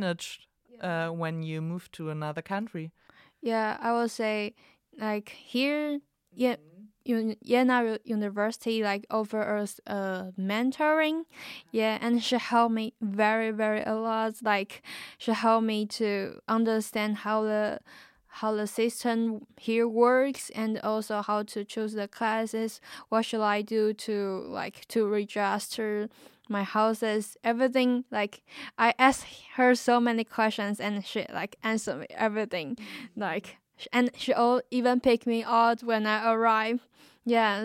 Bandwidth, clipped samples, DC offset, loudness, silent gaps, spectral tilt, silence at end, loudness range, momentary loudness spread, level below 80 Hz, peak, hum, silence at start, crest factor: 16 kHz; under 0.1%; under 0.1%; -28 LUFS; none; -5 dB/octave; 0 s; 6 LU; 12 LU; -72 dBFS; -6 dBFS; none; 0 s; 22 dB